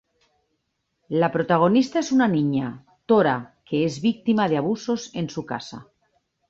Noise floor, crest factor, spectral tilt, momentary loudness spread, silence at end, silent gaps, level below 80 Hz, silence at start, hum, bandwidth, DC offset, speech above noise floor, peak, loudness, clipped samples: -75 dBFS; 18 dB; -6.5 dB/octave; 13 LU; 0.65 s; none; -62 dBFS; 1.1 s; none; 7.8 kHz; under 0.1%; 53 dB; -4 dBFS; -22 LUFS; under 0.1%